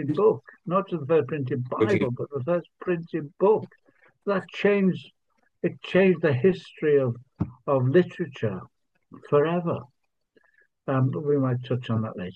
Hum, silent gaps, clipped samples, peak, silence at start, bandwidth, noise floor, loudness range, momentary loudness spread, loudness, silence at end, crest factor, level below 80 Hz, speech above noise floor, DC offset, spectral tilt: none; none; under 0.1%; -8 dBFS; 0 s; 7.4 kHz; -67 dBFS; 3 LU; 10 LU; -25 LUFS; 0 s; 16 dB; -66 dBFS; 42 dB; under 0.1%; -9 dB/octave